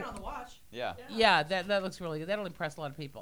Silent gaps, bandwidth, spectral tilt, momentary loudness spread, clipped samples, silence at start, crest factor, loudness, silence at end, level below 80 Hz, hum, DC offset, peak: none; over 20 kHz; -4.5 dB/octave; 17 LU; under 0.1%; 0 s; 24 dB; -31 LUFS; 0 s; -56 dBFS; none; 0.2%; -10 dBFS